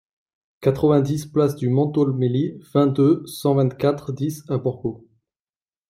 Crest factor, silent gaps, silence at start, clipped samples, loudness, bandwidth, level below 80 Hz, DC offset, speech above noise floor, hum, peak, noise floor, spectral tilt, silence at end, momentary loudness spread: 16 dB; none; 0.6 s; under 0.1%; -21 LUFS; 16 kHz; -58 dBFS; under 0.1%; over 70 dB; none; -6 dBFS; under -90 dBFS; -8 dB/octave; 0.9 s; 8 LU